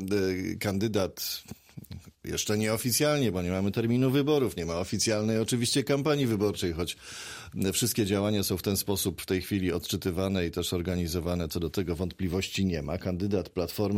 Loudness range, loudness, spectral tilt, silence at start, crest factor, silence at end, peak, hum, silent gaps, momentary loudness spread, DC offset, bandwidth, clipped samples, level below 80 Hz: 3 LU; -29 LUFS; -4.5 dB/octave; 0 s; 16 dB; 0 s; -14 dBFS; none; none; 8 LU; under 0.1%; 16 kHz; under 0.1%; -50 dBFS